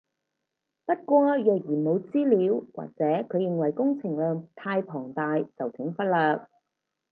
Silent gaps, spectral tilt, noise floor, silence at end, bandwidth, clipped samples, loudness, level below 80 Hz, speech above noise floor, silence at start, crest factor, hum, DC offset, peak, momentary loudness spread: none; -10.5 dB/octave; -83 dBFS; 0.65 s; 4.4 kHz; under 0.1%; -26 LUFS; -80 dBFS; 58 dB; 0.9 s; 18 dB; none; under 0.1%; -8 dBFS; 10 LU